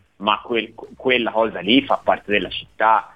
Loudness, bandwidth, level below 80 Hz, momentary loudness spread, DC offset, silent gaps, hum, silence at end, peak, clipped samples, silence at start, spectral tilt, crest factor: -19 LUFS; 5.6 kHz; -54 dBFS; 8 LU; under 0.1%; none; none; 0.1 s; -2 dBFS; under 0.1%; 0.2 s; -6.5 dB/octave; 18 dB